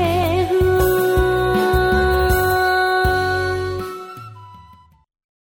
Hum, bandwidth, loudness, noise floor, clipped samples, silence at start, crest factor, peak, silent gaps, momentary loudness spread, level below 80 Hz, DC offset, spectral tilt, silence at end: none; 18 kHz; -17 LUFS; -49 dBFS; under 0.1%; 0 s; 12 dB; -6 dBFS; none; 13 LU; -28 dBFS; under 0.1%; -5.5 dB/octave; 0.9 s